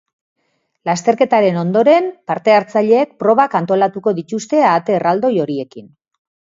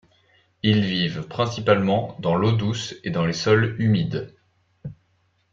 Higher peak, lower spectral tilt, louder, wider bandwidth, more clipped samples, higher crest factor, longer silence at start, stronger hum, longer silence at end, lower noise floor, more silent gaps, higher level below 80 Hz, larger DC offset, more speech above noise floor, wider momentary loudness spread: first, 0 dBFS vs -4 dBFS; about the same, -6 dB/octave vs -6.5 dB/octave; first, -15 LUFS vs -22 LUFS; about the same, 7.8 kHz vs 7.6 kHz; neither; about the same, 16 dB vs 20 dB; first, 0.85 s vs 0.65 s; neither; first, 0.75 s vs 0.6 s; second, -59 dBFS vs -66 dBFS; neither; second, -66 dBFS vs -56 dBFS; neither; about the same, 45 dB vs 45 dB; second, 9 LU vs 18 LU